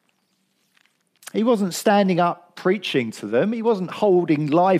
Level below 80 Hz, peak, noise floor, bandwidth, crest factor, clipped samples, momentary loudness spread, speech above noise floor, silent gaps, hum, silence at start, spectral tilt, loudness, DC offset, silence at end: -74 dBFS; -4 dBFS; -68 dBFS; 15.5 kHz; 16 dB; under 0.1%; 6 LU; 49 dB; none; none; 1.35 s; -6 dB/octave; -21 LUFS; under 0.1%; 0 s